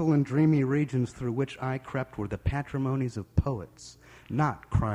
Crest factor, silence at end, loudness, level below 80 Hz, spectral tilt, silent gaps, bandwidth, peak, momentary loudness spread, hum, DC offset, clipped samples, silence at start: 18 dB; 0 s; -29 LUFS; -44 dBFS; -8 dB/octave; none; 10.5 kHz; -10 dBFS; 11 LU; none; under 0.1%; under 0.1%; 0 s